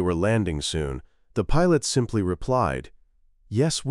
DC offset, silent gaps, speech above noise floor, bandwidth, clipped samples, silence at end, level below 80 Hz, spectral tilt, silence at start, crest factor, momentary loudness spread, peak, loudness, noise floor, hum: under 0.1%; none; 36 dB; 14 kHz; under 0.1%; 0 s; -36 dBFS; -5.5 dB/octave; 0 s; 16 dB; 11 LU; -8 dBFS; -25 LUFS; -59 dBFS; none